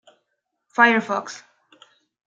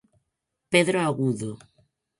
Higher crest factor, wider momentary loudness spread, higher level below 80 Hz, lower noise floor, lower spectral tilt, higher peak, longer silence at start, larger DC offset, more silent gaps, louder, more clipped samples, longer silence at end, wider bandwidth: about the same, 22 dB vs 22 dB; first, 21 LU vs 15 LU; second, -80 dBFS vs -66 dBFS; second, -77 dBFS vs -81 dBFS; about the same, -4 dB/octave vs -5 dB/octave; first, -2 dBFS vs -6 dBFS; about the same, 0.8 s vs 0.7 s; neither; neither; first, -19 LUFS vs -24 LUFS; neither; first, 0.9 s vs 0.65 s; second, 7.8 kHz vs 11.5 kHz